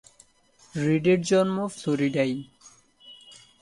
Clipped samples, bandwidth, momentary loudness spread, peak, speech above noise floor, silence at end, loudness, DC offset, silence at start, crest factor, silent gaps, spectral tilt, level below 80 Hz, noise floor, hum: under 0.1%; 11.5 kHz; 16 LU; -10 dBFS; 35 dB; 0.3 s; -25 LUFS; under 0.1%; 0.75 s; 18 dB; none; -6 dB/octave; -64 dBFS; -59 dBFS; none